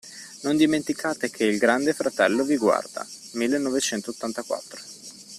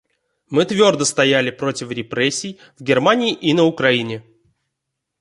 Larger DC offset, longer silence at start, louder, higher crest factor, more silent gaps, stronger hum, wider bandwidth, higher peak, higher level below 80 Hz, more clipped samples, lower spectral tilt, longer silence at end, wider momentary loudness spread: neither; second, 0.05 s vs 0.5 s; second, -24 LUFS vs -17 LUFS; about the same, 20 dB vs 18 dB; neither; neither; first, 14.5 kHz vs 11.5 kHz; about the same, -4 dBFS vs -2 dBFS; about the same, -66 dBFS vs -62 dBFS; neither; about the same, -3.5 dB/octave vs -4 dB/octave; second, 0 s vs 1 s; first, 15 LU vs 12 LU